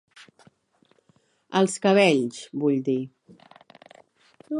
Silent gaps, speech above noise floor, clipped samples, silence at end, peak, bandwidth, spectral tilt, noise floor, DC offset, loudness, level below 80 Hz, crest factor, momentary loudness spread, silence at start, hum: none; 42 dB; under 0.1%; 0 s; -6 dBFS; 11.5 kHz; -5 dB/octave; -65 dBFS; under 0.1%; -23 LUFS; -78 dBFS; 22 dB; 11 LU; 1.5 s; none